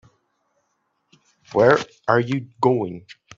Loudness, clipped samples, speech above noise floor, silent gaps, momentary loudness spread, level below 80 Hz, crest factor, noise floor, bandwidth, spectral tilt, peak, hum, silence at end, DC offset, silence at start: -20 LUFS; under 0.1%; 52 dB; none; 11 LU; -62 dBFS; 22 dB; -71 dBFS; 7.8 kHz; -7 dB/octave; -2 dBFS; none; 0.4 s; under 0.1%; 1.55 s